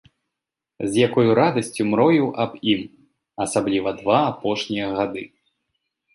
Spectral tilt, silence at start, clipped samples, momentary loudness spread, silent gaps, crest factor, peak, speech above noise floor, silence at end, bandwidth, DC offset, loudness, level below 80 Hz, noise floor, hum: -5.5 dB/octave; 0.8 s; under 0.1%; 12 LU; none; 18 dB; -4 dBFS; 65 dB; 0.9 s; 11.5 kHz; under 0.1%; -21 LUFS; -58 dBFS; -85 dBFS; none